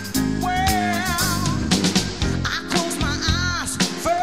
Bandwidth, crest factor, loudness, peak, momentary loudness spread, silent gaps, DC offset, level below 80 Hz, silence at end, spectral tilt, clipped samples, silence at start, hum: 16 kHz; 18 dB; -21 LUFS; -4 dBFS; 3 LU; none; 0.6%; -34 dBFS; 0 s; -3.5 dB/octave; under 0.1%; 0 s; none